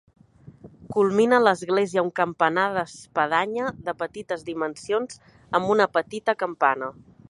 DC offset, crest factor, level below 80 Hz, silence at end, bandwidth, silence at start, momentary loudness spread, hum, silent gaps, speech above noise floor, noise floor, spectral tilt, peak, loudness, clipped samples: under 0.1%; 20 dB; -62 dBFS; 0.4 s; 11.5 kHz; 0.45 s; 11 LU; none; none; 24 dB; -48 dBFS; -5 dB/octave; -4 dBFS; -24 LUFS; under 0.1%